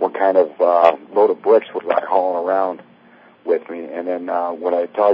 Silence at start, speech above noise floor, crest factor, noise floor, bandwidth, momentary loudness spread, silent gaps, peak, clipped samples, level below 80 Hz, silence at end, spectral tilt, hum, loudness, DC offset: 0 s; 31 dB; 18 dB; -48 dBFS; 5.4 kHz; 11 LU; none; 0 dBFS; under 0.1%; -76 dBFS; 0 s; -7 dB/octave; none; -18 LUFS; under 0.1%